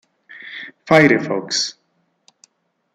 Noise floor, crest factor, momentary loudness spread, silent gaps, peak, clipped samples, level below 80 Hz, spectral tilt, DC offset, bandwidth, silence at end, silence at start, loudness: -66 dBFS; 18 dB; 21 LU; none; -2 dBFS; under 0.1%; -60 dBFS; -4 dB/octave; under 0.1%; 12 kHz; 1.25 s; 0.4 s; -16 LUFS